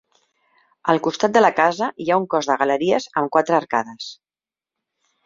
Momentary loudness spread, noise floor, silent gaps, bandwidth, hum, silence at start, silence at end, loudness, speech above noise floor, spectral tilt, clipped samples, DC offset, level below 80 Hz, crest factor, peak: 10 LU; under -90 dBFS; none; 7.8 kHz; none; 0.85 s; 1.1 s; -19 LUFS; over 71 dB; -4.5 dB/octave; under 0.1%; under 0.1%; -66 dBFS; 20 dB; -2 dBFS